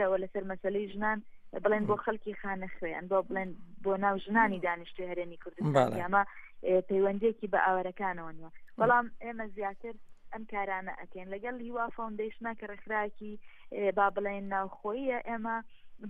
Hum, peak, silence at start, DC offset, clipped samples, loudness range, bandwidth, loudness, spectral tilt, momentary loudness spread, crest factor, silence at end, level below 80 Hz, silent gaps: none; -10 dBFS; 0 s; under 0.1%; under 0.1%; 7 LU; 12 kHz; -33 LUFS; -7.5 dB/octave; 15 LU; 22 dB; 0 s; -60 dBFS; none